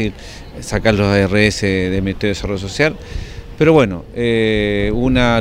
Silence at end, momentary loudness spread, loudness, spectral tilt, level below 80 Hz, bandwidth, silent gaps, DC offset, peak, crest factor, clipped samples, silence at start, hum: 0 s; 17 LU; -16 LUFS; -6 dB/octave; -30 dBFS; 15 kHz; none; under 0.1%; 0 dBFS; 16 dB; under 0.1%; 0 s; none